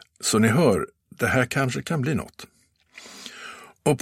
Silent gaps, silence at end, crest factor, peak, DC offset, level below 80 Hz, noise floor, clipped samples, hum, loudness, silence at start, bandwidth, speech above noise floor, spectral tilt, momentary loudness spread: none; 0 s; 20 dB; -6 dBFS; under 0.1%; -54 dBFS; -51 dBFS; under 0.1%; none; -23 LUFS; 0.2 s; 16 kHz; 29 dB; -5 dB/octave; 20 LU